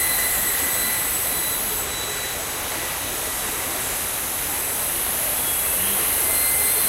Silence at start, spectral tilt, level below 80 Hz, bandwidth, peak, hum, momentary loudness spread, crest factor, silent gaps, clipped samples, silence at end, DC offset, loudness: 0 s; -0.5 dB/octave; -44 dBFS; 16 kHz; -8 dBFS; none; 7 LU; 16 dB; none; under 0.1%; 0 s; under 0.1%; -20 LUFS